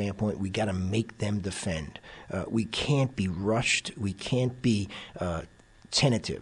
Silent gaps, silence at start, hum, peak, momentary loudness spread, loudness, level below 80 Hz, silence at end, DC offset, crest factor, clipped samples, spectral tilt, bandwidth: none; 0 s; none; -12 dBFS; 11 LU; -29 LUFS; -52 dBFS; 0 s; under 0.1%; 18 dB; under 0.1%; -5 dB/octave; 11 kHz